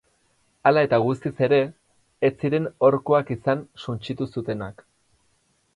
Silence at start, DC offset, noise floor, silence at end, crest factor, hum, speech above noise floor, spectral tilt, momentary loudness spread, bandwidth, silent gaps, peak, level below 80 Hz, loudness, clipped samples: 0.65 s; under 0.1%; -66 dBFS; 1.05 s; 20 dB; none; 44 dB; -8 dB/octave; 12 LU; 11 kHz; none; -4 dBFS; -60 dBFS; -23 LUFS; under 0.1%